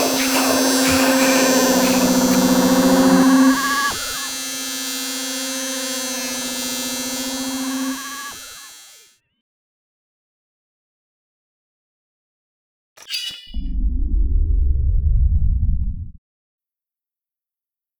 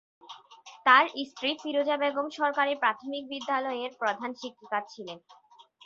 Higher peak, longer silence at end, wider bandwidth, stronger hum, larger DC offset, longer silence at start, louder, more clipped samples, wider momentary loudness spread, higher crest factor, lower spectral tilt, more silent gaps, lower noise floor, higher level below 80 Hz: first, -2 dBFS vs -6 dBFS; first, 1.9 s vs 0.55 s; first, over 20 kHz vs 7.6 kHz; neither; neither; second, 0 s vs 0.25 s; first, -18 LUFS vs -28 LUFS; neither; second, 14 LU vs 22 LU; second, 18 dB vs 24 dB; about the same, -3.5 dB/octave vs -2.5 dB/octave; first, 9.41-12.96 s vs none; first, under -90 dBFS vs -52 dBFS; first, -26 dBFS vs -80 dBFS